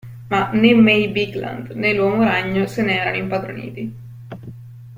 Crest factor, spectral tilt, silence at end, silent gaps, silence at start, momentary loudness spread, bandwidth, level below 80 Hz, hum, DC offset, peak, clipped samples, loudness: 18 dB; -7 dB/octave; 0 s; none; 0.05 s; 22 LU; 16 kHz; -52 dBFS; none; under 0.1%; -2 dBFS; under 0.1%; -17 LUFS